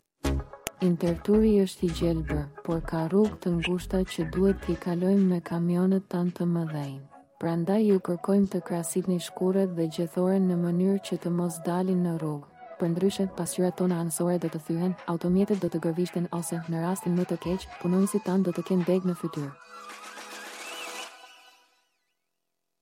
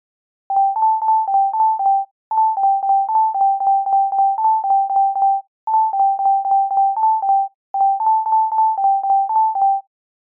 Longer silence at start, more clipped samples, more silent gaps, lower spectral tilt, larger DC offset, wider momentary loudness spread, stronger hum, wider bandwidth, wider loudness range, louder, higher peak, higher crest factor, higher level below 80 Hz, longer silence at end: second, 0.25 s vs 0.5 s; neither; second, none vs 2.11-2.31 s, 5.48-5.67 s, 7.55-7.74 s; about the same, -7 dB/octave vs -7 dB/octave; neither; first, 12 LU vs 3 LU; neither; first, 16.5 kHz vs 1.6 kHz; about the same, 3 LU vs 1 LU; second, -28 LUFS vs -17 LUFS; first, -6 dBFS vs -10 dBFS; first, 20 dB vs 8 dB; first, -46 dBFS vs -84 dBFS; first, 1.55 s vs 0.5 s